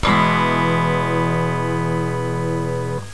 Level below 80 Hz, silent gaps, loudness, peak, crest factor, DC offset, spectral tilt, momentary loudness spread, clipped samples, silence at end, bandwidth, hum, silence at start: -40 dBFS; none; -19 LUFS; -4 dBFS; 14 dB; 2%; -6.5 dB/octave; 7 LU; under 0.1%; 0 s; 11 kHz; none; 0 s